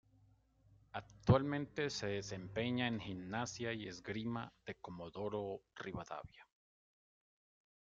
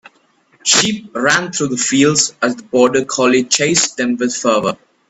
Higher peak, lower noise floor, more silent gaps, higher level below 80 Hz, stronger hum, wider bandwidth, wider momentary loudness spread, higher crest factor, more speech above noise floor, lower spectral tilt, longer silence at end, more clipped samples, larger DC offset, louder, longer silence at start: second, -16 dBFS vs 0 dBFS; first, -71 dBFS vs -55 dBFS; neither; second, -64 dBFS vs -56 dBFS; neither; second, 7.6 kHz vs 11.5 kHz; first, 16 LU vs 6 LU; first, 26 dB vs 16 dB; second, 29 dB vs 41 dB; first, -6 dB/octave vs -2.5 dB/octave; first, 1.45 s vs 0.35 s; neither; neither; second, -41 LUFS vs -14 LUFS; first, 0.95 s vs 0.65 s